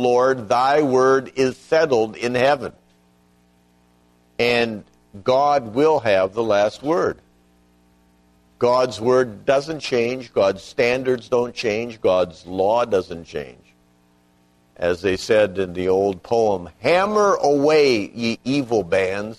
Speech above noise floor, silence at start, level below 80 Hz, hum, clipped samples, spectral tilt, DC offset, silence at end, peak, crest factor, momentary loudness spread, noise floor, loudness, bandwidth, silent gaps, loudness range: 39 dB; 0 s; -56 dBFS; 60 Hz at -50 dBFS; under 0.1%; -5 dB/octave; under 0.1%; 0 s; -4 dBFS; 16 dB; 8 LU; -58 dBFS; -19 LUFS; 12.5 kHz; none; 5 LU